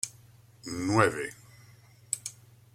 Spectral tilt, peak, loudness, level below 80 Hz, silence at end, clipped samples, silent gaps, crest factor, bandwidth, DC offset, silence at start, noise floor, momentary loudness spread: -4.5 dB/octave; -6 dBFS; -30 LUFS; -66 dBFS; 0.45 s; under 0.1%; none; 26 dB; 16.5 kHz; under 0.1%; 0.05 s; -56 dBFS; 19 LU